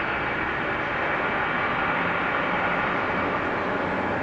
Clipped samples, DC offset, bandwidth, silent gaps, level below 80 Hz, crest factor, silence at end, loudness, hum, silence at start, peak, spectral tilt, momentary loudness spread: under 0.1%; under 0.1%; 8.6 kHz; none; -50 dBFS; 14 dB; 0 s; -25 LUFS; none; 0 s; -12 dBFS; -6.5 dB/octave; 2 LU